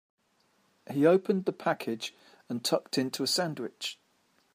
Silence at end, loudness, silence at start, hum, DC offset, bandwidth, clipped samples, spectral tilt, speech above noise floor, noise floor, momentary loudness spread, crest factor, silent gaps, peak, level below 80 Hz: 0.6 s; -30 LUFS; 0.9 s; none; under 0.1%; 15.5 kHz; under 0.1%; -4.5 dB/octave; 41 dB; -71 dBFS; 13 LU; 20 dB; none; -10 dBFS; -82 dBFS